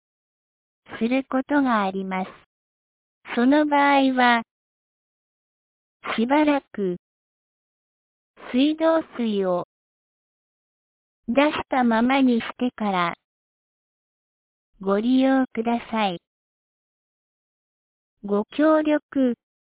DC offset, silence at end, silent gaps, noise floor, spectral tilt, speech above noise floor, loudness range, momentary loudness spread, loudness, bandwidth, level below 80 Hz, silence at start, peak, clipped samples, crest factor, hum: under 0.1%; 0.45 s; 2.46-3.21 s, 4.51-6.00 s, 6.99-8.34 s, 9.64-11.23 s, 13.24-14.73 s, 16.27-18.17 s, 19.02-19.09 s; under -90 dBFS; -9.5 dB/octave; over 69 dB; 5 LU; 12 LU; -22 LUFS; 4 kHz; -64 dBFS; 0.9 s; -6 dBFS; under 0.1%; 18 dB; none